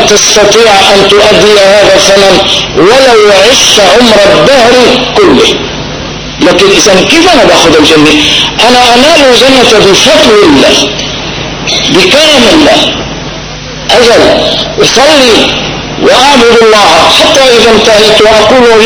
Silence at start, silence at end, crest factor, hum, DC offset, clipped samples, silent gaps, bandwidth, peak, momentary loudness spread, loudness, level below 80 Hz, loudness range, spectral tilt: 0 s; 0 s; 4 dB; none; 1%; 30%; none; 11 kHz; 0 dBFS; 10 LU; -2 LUFS; -28 dBFS; 3 LU; -2.5 dB/octave